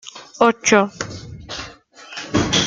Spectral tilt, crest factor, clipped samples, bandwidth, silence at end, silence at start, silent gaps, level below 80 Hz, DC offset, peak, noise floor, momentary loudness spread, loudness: -3.5 dB/octave; 18 dB; under 0.1%; 9.6 kHz; 0 s; 0.05 s; none; -46 dBFS; under 0.1%; -2 dBFS; -41 dBFS; 20 LU; -18 LUFS